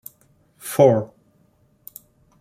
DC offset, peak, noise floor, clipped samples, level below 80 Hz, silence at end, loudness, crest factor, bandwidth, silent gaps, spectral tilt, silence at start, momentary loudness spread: under 0.1%; -2 dBFS; -60 dBFS; under 0.1%; -64 dBFS; 1.35 s; -18 LUFS; 22 dB; 16.5 kHz; none; -6.5 dB/octave; 0.65 s; 26 LU